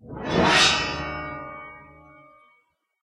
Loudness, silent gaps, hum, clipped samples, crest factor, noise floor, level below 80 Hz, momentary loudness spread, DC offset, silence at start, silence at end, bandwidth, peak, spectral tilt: -20 LUFS; none; none; under 0.1%; 20 dB; -67 dBFS; -48 dBFS; 22 LU; under 0.1%; 0.05 s; 1.15 s; 13.5 kHz; -6 dBFS; -3 dB/octave